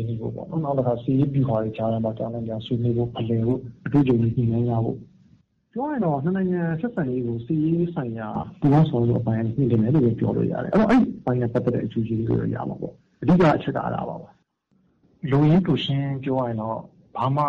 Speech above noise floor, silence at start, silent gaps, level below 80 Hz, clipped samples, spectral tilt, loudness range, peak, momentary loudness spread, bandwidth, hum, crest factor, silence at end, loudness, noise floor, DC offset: 43 dB; 0 s; none; -50 dBFS; under 0.1%; -9.5 dB/octave; 4 LU; -10 dBFS; 12 LU; 6.6 kHz; none; 12 dB; 0 s; -23 LUFS; -65 dBFS; under 0.1%